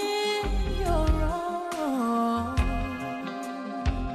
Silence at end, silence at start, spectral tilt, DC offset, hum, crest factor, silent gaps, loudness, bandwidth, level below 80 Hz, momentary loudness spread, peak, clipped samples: 0 s; 0 s; -6 dB/octave; under 0.1%; none; 16 dB; none; -29 LUFS; 14 kHz; -32 dBFS; 8 LU; -12 dBFS; under 0.1%